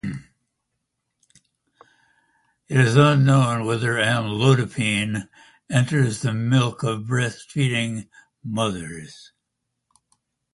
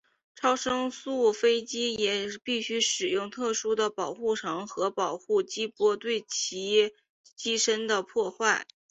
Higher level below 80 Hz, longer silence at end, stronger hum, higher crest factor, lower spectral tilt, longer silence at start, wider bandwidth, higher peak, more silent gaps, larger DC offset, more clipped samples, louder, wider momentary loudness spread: first, -56 dBFS vs -70 dBFS; first, 1.4 s vs 0.25 s; neither; about the same, 20 dB vs 18 dB; first, -6 dB/octave vs -1.5 dB/octave; second, 0.05 s vs 0.4 s; first, 11.5 kHz vs 8.2 kHz; first, -2 dBFS vs -10 dBFS; second, none vs 7.10-7.24 s; neither; neither; first, -21 LUFS vs -28 LUFS; first, 17 LU vs 6 LU